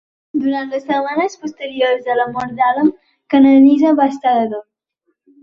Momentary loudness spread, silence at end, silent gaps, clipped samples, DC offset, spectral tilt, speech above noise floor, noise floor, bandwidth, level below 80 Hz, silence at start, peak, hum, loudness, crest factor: 13 LU; 0.8 s; none; under 0.1%; under 0.1%; -5.5 dB/octave; 55 dB; -69 dBFS; 7 kHz; -60 dBFS; 0.35 s; -2 dBFS; none; -15 LUFS; 14 dB